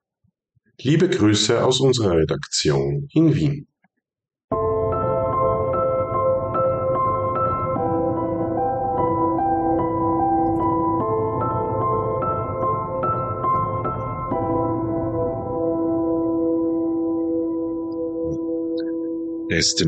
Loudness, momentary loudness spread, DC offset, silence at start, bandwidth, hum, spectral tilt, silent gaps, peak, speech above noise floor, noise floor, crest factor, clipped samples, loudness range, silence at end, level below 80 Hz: -21 LUFS; 7 LU; under 0.1%; 0.8 s; 9.2 kHz; none; -5.5 dB/octave; 4.44-4.48 s; -8 dBFS; 51 dB; -69 dBFS; 14 dB; under 0.1%; 4 LU; 0 s; -44 dBFS